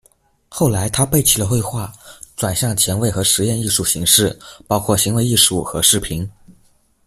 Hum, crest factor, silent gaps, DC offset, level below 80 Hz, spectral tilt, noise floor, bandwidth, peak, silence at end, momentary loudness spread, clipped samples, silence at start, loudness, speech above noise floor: none; 18 dB; none; under 0.1%; -42 dBFS; -3.5 dB/octave; -57 dBFS; 16 kHz; 0 dBFS; 0.55 s; 14 LU; under 0.1%; 0.5 s; -15 LUFS; 40 dB